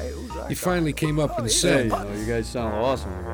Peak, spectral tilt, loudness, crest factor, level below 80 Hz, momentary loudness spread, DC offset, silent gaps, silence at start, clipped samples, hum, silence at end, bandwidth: -6 dBFS; -4 dB/octave; -24 LUFS; 18 dB; -36 dBFS; 9 LU; under 0.1%; none; 0 s; under 0.1%; none; 0 s; over 20 kHz